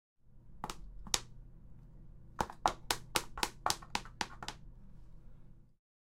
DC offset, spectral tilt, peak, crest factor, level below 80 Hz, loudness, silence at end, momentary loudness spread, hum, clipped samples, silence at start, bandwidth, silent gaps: under 0.1%; -1.5 dB/octave; -4 dBFS; 38 dB; -54 dBFS; -38 LUFS; 0.3 s; 24 LU; none; under 0.1%; 0.25 s; 16 kHz; none